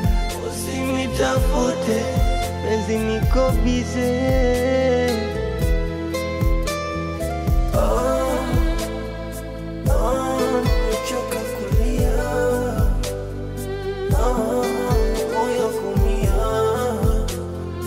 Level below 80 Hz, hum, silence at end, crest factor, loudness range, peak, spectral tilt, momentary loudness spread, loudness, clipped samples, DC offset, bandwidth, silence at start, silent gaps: -24 dBFS; none; 0 s; 14 dB; 3 LU; -6 dBFS; -6 dB/octave; 7 LU; -22 LUFS; under 0.1%; under 0.1%; 16 kHz; 0 s; none